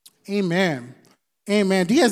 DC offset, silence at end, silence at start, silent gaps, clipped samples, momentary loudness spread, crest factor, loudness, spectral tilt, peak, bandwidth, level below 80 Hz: under 0.1%; 0 s; 0.3 s; none; under 0.1%; 12 LU; 16 dB; -21 LUFS; -5 dB/octave; -6 dBFS; 15 kHz; -76 dBFS